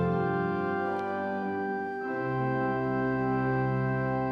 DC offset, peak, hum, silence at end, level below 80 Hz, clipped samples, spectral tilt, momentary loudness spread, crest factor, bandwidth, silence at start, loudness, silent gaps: under 0.1%; -18 dBFS; none; 0 s; -56 dBFS; under 0.1%; -9.5 dB/octave; 4 LU; 10 dB; 5.6 kHz; 0 s; -30 LUFS; none